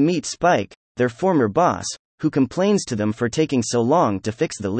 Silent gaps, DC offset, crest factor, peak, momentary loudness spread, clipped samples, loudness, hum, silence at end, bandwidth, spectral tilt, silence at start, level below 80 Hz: 0.76-0.95 s, 1.99-2.18 s; under 0.1%; 14 dB; -6 dBFS; 6 LU; under 0.1%; -20 LUFS; none; 0 s; 8.8 kHz; -5.5 dB/octave; 0 s; -56 dBFS